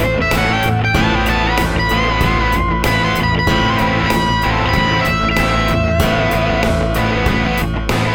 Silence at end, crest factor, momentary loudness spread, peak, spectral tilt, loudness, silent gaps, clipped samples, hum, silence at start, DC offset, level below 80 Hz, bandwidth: 0 s; 14 dB; 2 LU; 0 dBFS; -5.5 dB/octave; -15 LUFS; none; under 0.1%; none; 0 s; under 0.1%; -22 dBFS; 19 kHz